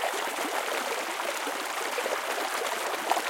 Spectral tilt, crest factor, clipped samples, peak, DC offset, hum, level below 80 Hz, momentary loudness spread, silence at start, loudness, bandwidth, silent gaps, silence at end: 0.5 dB/octave; 22 dB; under 0.1%; -10 dBFS; under 0.1%; none; -80 dBFS; 2 LU; 0 s; -30 LUFS; 17 kHz; none; 0 s